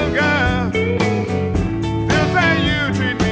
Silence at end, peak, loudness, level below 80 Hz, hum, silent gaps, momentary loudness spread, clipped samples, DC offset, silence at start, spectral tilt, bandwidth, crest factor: 0 s; -2 dBFS; -17 LUFS; -30 dBFS; none; none; 5 LU; under 0.1%; under 0.1%; 0 s; -6 dB/octave; 8 kHz; 14 dB